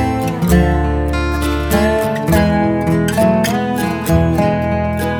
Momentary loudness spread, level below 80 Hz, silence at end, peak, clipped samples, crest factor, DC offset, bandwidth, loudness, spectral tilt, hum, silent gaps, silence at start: 4 LU; -24 dBFS; 0 s; 0 dBFS; under 0.1%; 14 dB; under 0.1%; over 20 kHz; -15 LUFS; -6.5 dB/octave; none; none; 0 s